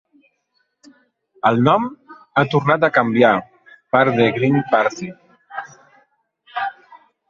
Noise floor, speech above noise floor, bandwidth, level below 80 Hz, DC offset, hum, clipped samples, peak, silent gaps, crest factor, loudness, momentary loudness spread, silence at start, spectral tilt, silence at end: -68 dBFS; 53 dB; 7.4 kHz; -60 dBFS; under 0.1%; none; under 0.1%; -2 dBFS; none; 18 dB; -17 LUFS; 18 LU; 1.45 s; -7 dB/octave; 0.35 s